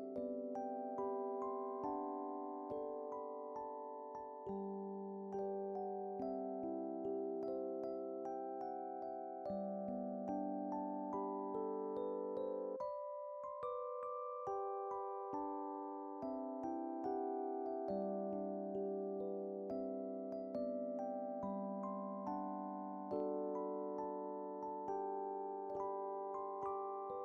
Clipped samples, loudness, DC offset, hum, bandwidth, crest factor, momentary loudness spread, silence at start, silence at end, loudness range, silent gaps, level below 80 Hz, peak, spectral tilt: under 0.1%; -44 LUFS; under 0.1%; none; 6.2 kHz; 14 dB; 4 LU; 0 s; 0 s; 2 LU; none; -82 dBFS; -30 dBFS; -9 dB/octave